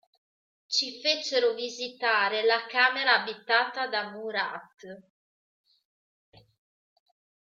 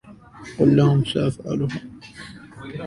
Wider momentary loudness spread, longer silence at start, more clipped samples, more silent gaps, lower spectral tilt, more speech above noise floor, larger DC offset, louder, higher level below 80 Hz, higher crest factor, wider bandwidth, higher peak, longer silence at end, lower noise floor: second, 11 LU vs 23 LU; first, 0.7 s vs 0.05 s; neither; neither; second, -1 dB/octave vs -7.5 dB/octave; first, over 62 dB vs 22 dB; neither; second, -26 LUFS vs -20 LUFS; second, -84 dBFS vs -50 dBFS; about the same, 22 dB vs 18 dB; second, 7.6 kHz vs 11 kHz; second, -8 dBFS vs -4 dBFS; first, 2.45 s vs 0 s; first, under -90 dBFS vs -42 dBFS